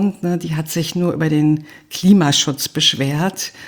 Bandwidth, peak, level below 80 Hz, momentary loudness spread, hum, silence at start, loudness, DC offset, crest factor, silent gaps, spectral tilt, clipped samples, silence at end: over 20 kHz; 0 dBFS; -54 dBFS; 9 LU; none; 0 s; -17 LUFS; under 0.1%; 16 dB; none; -4.5 dB/octave; under 0.1%; 0 s